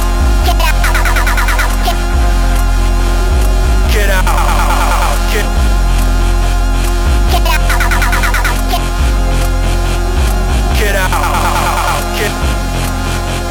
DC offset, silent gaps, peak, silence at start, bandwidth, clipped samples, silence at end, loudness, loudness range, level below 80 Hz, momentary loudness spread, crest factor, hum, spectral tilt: under 0.1%; none; 0 dBFS; 0 s; 17.5 kHz; under 0.1%; 0 s; -13 LUFS; 1 LU; -12 dBFS; 3 LU; 10 dB; none; -4.5 dB/octave